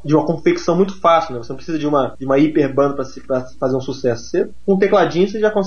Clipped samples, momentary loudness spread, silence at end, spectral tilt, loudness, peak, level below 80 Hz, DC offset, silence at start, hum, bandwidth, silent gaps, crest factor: under 0.1%; 9 LU; 0 s; -6.5 dB/octave; -17 LUFS; -2 dBFS; -48 dBFS; 3%; 0.05 s; none; 7 kHz; none; 14 dB